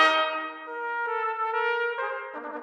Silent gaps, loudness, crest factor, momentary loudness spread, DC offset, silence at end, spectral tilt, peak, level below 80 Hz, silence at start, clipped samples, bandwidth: none; -28 LUFS; 22 dB; 9 LU; under 0.1%; 0 s; 0 dB/octave; -4 dBFS; under -90 dBFS; 0 s; under 0.1%; 10.5 kHz